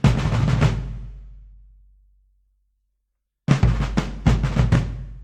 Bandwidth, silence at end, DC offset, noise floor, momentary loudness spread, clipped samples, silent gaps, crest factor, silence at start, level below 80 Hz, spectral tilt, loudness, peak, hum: 9.6 kHz; 0 s; under 0.1%; -77 dBFS; 13 LU; under 0.1%; none; 20 dB; 0.05 s; -28 dBFS; -7 dB/octave; -21 LUFS; -2 dBFS; none